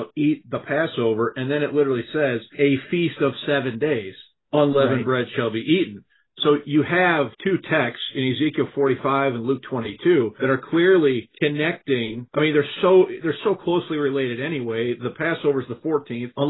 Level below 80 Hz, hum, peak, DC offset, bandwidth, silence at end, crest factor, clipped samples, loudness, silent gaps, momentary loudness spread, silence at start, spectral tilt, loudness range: -64 dBFS; none; -6 dBFS; under 0.1%; 4.1 kHz; 0 s; 16 dB; under 0.1%; -22 LUFS; none; 7 LU; 0 s; -11 dB/octave; 2 LU